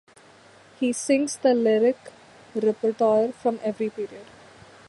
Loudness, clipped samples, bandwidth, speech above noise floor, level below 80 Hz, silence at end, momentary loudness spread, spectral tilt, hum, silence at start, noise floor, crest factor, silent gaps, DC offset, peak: -24 LUFS; under 0.1%; 11.5 kHz; 29 dB; -70 dBFS; 0.65 s; 14 LU; -4.5 dB/octave; none; 0.8 s; -52 dBFS; 16 dB; none; under 0.1%; -8 dBFS